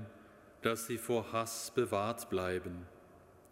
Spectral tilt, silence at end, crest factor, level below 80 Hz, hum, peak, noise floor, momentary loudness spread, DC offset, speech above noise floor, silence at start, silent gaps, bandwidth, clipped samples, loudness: -4.5 dB/octave; 0.05 s; 22 dB; -68 dBFS; none; -16 dBFS; -60 dBFS; 14 LU; under 0.1%; 24 dB; 0 s; none; 16 kHz; under 0.1%; -37 LUFS